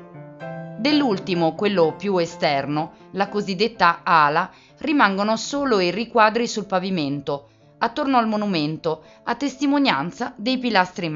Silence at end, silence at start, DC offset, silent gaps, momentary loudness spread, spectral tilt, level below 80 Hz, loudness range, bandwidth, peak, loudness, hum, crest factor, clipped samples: 0 s; 0 s; under 0.1%; none; 11 LU; -3.5 dB/octave; -60 dBFS; 4 LU; 7.8 kHz; -2 dBFS; -21 LUFS; none; 20 dB; under 0.1%